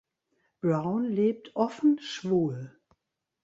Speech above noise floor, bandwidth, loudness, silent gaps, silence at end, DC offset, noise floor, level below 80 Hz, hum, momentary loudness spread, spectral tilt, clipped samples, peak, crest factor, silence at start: 53 dB; 7.8 kHz; -28 LUFS; none; 0.75 s; under 0.1%; -81 dBFS; -70 dBFS; none; 7 LU; -7.5 dB/octave; under 0.1%; -12 dBFS; 18 dB; 0.65 s